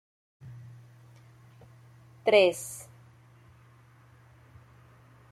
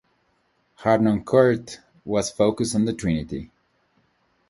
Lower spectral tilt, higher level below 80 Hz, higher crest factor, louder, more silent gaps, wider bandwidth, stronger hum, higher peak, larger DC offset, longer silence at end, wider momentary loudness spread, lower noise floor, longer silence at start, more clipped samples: second, -3.5 dB/octave vs -6 dB/octave; second, -70 dBFS vs -50 dBFS; first, 26 dB vs 20 dB; second, -25 LUFS vs -22 LUFS; neither; first, 15 kHz vs 11.5 kHz; neither; second, -8 dBFS vs -2 dBFS; neither; first, 2.5 s vs 1.05 s; first, 29 LU vs 16 LU; second, -57 dBFS vs -67 dBFS; second, 0.45 s vs 0.8 s; neither